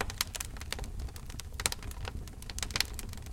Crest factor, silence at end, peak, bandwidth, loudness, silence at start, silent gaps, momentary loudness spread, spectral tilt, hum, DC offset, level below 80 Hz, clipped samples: 30 dB; 0 s; -6 dBFS; 17 kHz; -37 LUFS; 0 s; none; 10 LU; -2 dB/octave; none; under 0.1%; -44 dBFS; under 0.1%